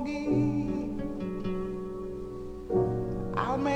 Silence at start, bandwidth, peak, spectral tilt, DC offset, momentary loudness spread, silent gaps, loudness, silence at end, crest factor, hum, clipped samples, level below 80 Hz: 0 s; 9.2 kHz; -12 dBFS; -8 dB/octave; under 0.1%; 11 LU; none; -32 LUFS; 0 s; 18 dB; none; under 0.1%; -46 dBFS